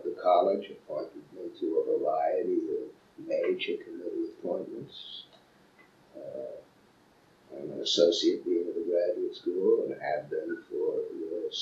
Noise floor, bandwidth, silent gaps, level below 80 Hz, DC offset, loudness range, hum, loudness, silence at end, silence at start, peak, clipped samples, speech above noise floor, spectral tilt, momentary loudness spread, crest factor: -62 dBFS; 8 kHz; none; -78 dBFS; under 0.1%; 11 LU; none; -30 LUFS; 0 s; 0 s; -10 dBFS; under 0.1%; 33 dB; -4 dB/octave; 18 LU; 22 dB